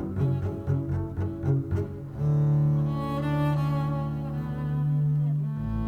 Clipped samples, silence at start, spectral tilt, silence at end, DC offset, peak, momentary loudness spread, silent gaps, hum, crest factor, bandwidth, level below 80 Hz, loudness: under 0.1%; 0 s; -10 dB/octave; 0 s; under 0.1%; -14 dBFS; 7 LU; none; none; 12 dB; 4.4 kHz; -44 dBFS; -27 LUFS